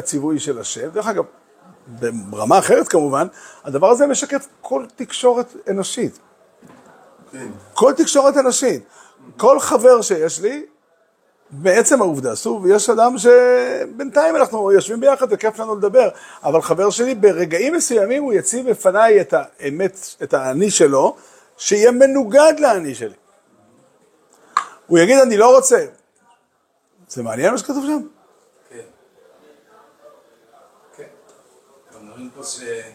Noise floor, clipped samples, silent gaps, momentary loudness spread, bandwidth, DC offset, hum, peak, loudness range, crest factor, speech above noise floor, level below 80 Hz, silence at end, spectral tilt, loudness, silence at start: -64 dBFS; under 0.1%; none; 15 LU; 16 kHz; under 0.1%; none; 0 dBFS; 9 LU; 16 dB; 49 dB; -68 dBFS; 0.05 s; -3.5 dB/octave; -16 LUFS; 0 s